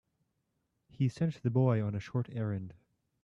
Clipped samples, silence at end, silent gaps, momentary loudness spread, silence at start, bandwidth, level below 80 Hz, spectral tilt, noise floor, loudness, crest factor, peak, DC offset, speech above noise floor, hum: under 0.1%; 0.5 s; none; 9 LU; 1 s; 7.6 kHz; -68 dBFS; -9 dB/octave; -81 dBFS; -33 LUFS; 18 dB; -16 dBFS; under 0.1%; 49 dB; none